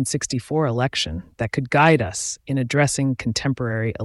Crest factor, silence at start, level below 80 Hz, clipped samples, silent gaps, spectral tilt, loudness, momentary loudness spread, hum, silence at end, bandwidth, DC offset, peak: 16 dB; 0 s; -46 dBFS; under 0.1%; none; -4.5 dB/octave; -21 LUFS; 9 LU; none; 0 s; 12 kHz; under 0.1%; -4 dBFS